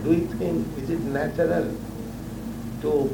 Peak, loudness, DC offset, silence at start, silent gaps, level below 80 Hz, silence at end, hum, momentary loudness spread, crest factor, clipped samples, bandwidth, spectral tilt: -10 dBFS; -27 LUFS; under 0.1%; 0 s; none; -44 dBFS; 0 s; none; 11 LU; 16 dB; under 0.1%; 19.5 kHz; -7.5 dB/octave